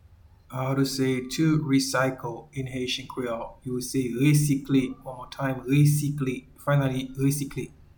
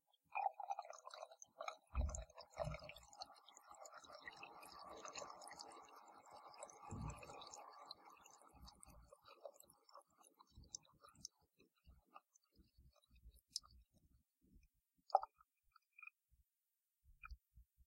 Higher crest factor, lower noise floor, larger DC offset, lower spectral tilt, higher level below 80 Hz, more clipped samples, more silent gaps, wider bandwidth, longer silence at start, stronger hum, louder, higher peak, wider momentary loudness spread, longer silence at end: second, 16 dB vs 34 dB; second, -54 dBFS vs under -90 dBFS; neither; first, -6 dB/octave vs -3.5 dB/octave; first, -52 dBFS vs -60 dBFS; neither; neither; first, 19 kHz vs 16 kHz; first, 0.5 s vs 0.3 s; neither; first, -26 LUFS vs -52 LUFS; first, -10 dBFS vs -18 dBFS; second, 12 LU vs 20 LU; first, 0.3 s vs 0.05 s